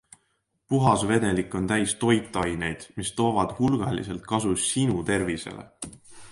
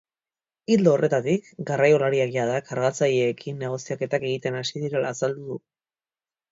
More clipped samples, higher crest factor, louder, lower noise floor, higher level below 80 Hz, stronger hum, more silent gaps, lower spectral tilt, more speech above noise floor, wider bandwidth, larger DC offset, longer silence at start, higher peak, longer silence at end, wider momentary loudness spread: neither; about the same, 20 dB vs 20 dB; about the same, -25 LUFS vs -24 LUFS; second, -73 dBFS vs under -90 dBFS; first, -48 dBFS vs -68 dBFS; neither; neither; about the same, -5 dB/octave vs -5.5 dB/octave; second, 48 dB vs over 67 dB; first, 11.5 kHz vs 7.8 kHz; neither; about the same, 0.7 s vs 0.7 s; about the same, -6 dBFS vs -4 dBFS; second, 0 s vs 0.95 s; about the same, 11 LU vs 11 LU